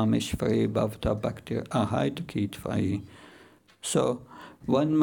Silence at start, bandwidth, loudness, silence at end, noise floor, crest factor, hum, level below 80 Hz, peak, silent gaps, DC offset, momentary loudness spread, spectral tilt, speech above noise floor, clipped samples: 0 s; 19.5 kHz; -29 LUFS; 0 s; -56 dBFS; 16 dB; none; -50 dBFS; -12 dBFS; none; under 0.1%; 11 LU; -6 dB/octave; 29 dB; under 0.1%